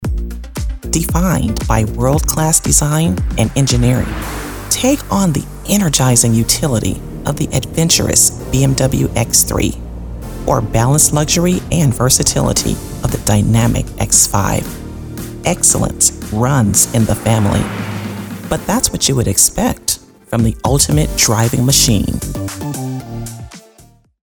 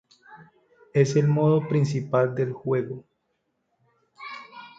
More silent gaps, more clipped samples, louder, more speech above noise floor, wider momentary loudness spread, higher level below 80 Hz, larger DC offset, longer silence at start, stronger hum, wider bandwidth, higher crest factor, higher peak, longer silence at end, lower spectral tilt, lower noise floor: neither; neither; first, -13 LUFS vs -23 LUFS; second, 33 dB vs 53 dB; second, 14 LU vs 19 LU; first, -26 dBFS vs -66 dBFS; neither; second, 0 s vs 0.3 s; neither; first, over 20 kHz vs 7.8 kHz; second, 14 dB vs 20 dB; first, 0 dBFS vs -6 dBFS; first, 0.65 s vs 0.1 s; second, -4 dB/octave vs -7.5 dB/octave; second, -46 dBFS vs -75 dBFS